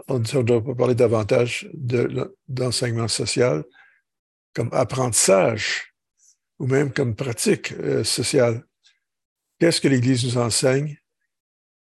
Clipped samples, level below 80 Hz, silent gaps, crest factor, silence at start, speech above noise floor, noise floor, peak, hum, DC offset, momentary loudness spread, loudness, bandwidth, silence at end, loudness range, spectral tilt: under 0.1%; -54 dBFS; 4.19-4.53 s, 9.25-9.36 s; 18 dB; 0.1 s; 43 dB; -63 dBFS; -4 dBFS; none; under 0.1%; 10 LU; -21 LUFS; 13 kHz; 0.85 s; 2 LU; -4.5 dB/octave